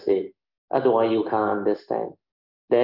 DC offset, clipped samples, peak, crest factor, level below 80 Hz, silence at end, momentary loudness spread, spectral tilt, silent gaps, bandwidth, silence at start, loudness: under 0.1%; under 0.1%; -8 dBFS; 16 dB; -72 dBFS; 0 s; 9 LU; -9 dB/octave; 0.58-0.68 s, 2.32-2.68 s; 5.8 kHz; 0 s; -24 LUFS